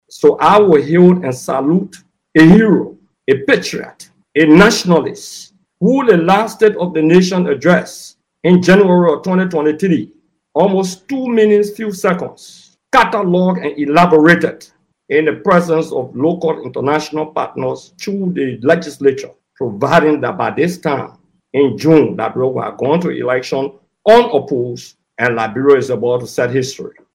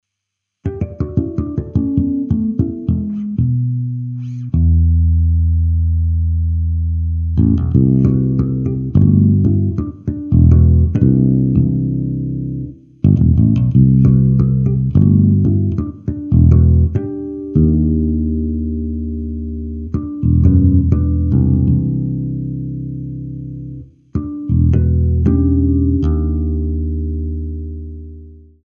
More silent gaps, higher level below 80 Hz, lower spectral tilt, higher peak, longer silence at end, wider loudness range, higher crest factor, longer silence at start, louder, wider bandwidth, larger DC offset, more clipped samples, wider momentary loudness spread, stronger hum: neither; second, -48 dBFS vs -22 dBFS; second, -6.5 dB/octave vs -13 dB/octave; about the same, 0 dBFS vs 0 dBFS; about the same, 0.25 s vs 0.3 s; about the same, 5 LU vs 6 LU; about the same, 14 dB vs 14 dB; second, 0.15 s vs 0.65 s; about the same, -13 LUFS vs -15 LUFS; first, 15 kHz vs 1.7 kHz; neither; first, 0.3% vs under 0.1%; about the same, 14 LU vs 13 LU; neither